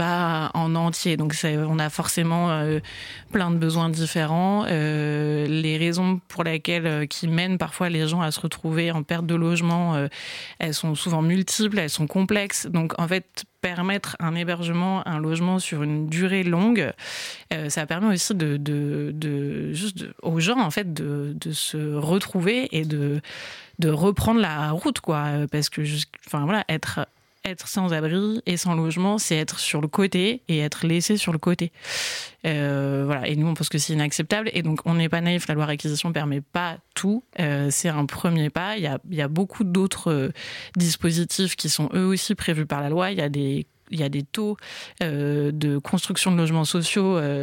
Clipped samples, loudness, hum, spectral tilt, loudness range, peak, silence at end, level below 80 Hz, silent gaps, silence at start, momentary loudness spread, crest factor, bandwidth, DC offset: under 0.1%; -24 LUFS; none; -5 dB/octave; 2 LU; -8 dBFS; 0 s; -56 dBFS; none; 0 s; 7 LU; 16 dB; 17 kHz; under 0.1%